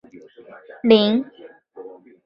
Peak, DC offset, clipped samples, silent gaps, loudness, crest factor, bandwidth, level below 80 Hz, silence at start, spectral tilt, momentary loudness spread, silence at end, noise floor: -2 dBFS; under 0.1%; under 0.1%; none; -18 LUFS; 20 dB; 5.6 kHz; -66 dBFS; 0.85 s; -8 dB/octave; 26 LU; 0.4 s; -45 dBFS